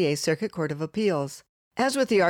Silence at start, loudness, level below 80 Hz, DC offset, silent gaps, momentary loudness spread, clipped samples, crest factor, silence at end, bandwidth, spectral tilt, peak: 0 s; -27 LUFS; -66 dBFS; under 0.1%; 1.49-1.71 s; 12 LU; under 0.1%; 16 dB; 0 s; 18.5 kHz; -5 dB/octave; -10 dBFS